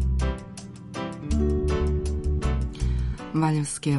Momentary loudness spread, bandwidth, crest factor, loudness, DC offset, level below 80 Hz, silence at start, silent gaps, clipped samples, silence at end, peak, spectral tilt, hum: 11 LU; 11.5 kHz; 16 dB; -27 LUFS; under 0.1%; -28 dBFS; 0 s; none; under 0.1%; 0 s; -10 dBFS; -6.5 dB/octave; none